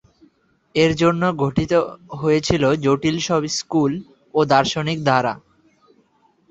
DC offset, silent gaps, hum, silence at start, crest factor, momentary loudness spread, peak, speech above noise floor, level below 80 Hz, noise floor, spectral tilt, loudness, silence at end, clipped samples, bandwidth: under 0.1%; none; none; 0.75 s; 18 dB; 9 LU; -2 dBFS; 41 dB; -48 dBFS; -60 dBFS; -5.5 dB/octave; -19 LUFS; 1.15 s; under 0.1%; 8.2 kHz